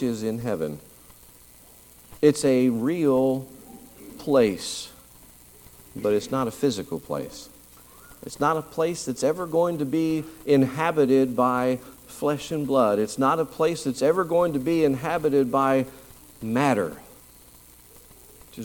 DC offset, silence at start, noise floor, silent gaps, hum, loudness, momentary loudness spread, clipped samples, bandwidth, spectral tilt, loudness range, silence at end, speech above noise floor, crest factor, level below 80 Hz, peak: under 0.1%; 0 s; -51 dBFS; none; none; -24 LUFS; 17 LU; under 0.1%; 19 kHz; -6 dB/octave; 5 LU; 0 s; 28 dB; 20 dB; -58 dBFS; -6 dBFS